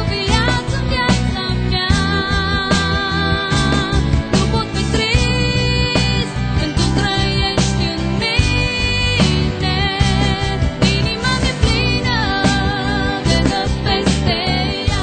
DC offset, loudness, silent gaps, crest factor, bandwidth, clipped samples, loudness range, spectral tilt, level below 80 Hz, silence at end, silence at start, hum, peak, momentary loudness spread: under 0.1%; -16 LUFS; none; 16 dB; 9.4 kHz; under 0.1%; 1 LU; -5 dB/octave; -24 dBFS; 0 s; 0 s; none; 0 dBFS; 3 LU